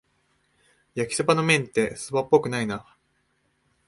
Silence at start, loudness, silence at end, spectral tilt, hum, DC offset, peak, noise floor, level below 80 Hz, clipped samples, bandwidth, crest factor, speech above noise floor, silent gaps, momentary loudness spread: 0.95 s; -23 LUFS; 1.05 s; -4.5 dB/octave; none; under 0.1%; -4 dBFS; -70 dBFS; -62 dBFS; under 0.1%; 11.5 kHz; 22 dB; 46 dB; none; 11 LU